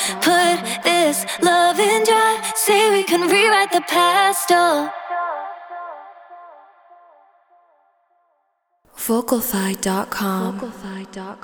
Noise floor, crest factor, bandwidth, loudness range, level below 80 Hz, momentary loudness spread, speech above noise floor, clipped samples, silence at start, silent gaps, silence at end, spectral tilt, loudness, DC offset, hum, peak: -68 dBFS; 18 dB; over 20 kHz; 15 LU; -60 dBFS; 18 LU; 49 dB; under 0.1%; 0 s; none; 0.05 s; -2.5 dB/octave; -17 LUFS; under 0.1%; none; -2 dBFS